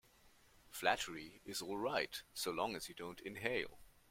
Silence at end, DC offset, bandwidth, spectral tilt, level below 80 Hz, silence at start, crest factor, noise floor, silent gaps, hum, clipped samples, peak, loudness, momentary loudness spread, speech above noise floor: 0.2 s; under 0.1%; 16.5 kHz; -2.5 dB/octave; -70 dBFS; 0.25 s; 26 dB; -68 dBFS; none; none; under 0.1%; -18 dBFS; -42 LUFS; 11 LU; 26 dB